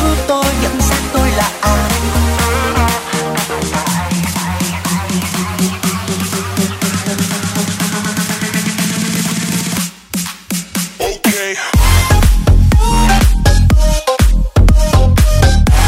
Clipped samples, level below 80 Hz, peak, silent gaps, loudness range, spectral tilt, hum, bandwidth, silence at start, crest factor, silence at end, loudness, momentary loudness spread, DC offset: under 0.1%; -16 dBFS; 0 dBFS; none; 5 LU; -4.5 dB/octave; none; 16.5 kHz; 0 s; 12 dB; 0 s; -14 LUFS; 7 LU; under 0.1%